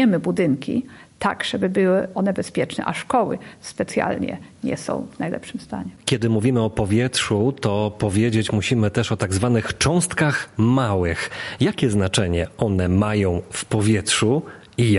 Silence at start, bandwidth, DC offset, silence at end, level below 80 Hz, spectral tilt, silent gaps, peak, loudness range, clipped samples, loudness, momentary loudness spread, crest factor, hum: 0 s; 11.5 kHz; under 0.1%; 0 s; -40 dBFS; -5.5 dB/octave; none; -2 dBFS; 4 LU; under 0.1%; -21 LUFS; 9 LU; 18 dB; none